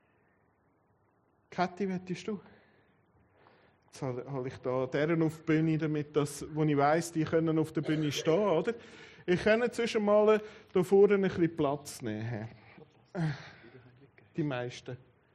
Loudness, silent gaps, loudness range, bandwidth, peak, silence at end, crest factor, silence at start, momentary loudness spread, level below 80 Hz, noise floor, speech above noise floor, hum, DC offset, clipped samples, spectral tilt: -31 LUFS; none; 12 LU; 13 kHz; -14 dBFS; 0.4 s; 18 dB; 1.5 s; 17 LU; -68 dBFS; -71 dBFS; 41 dB; none; under 0.1%; under 0.1%; -6.5 dB/octave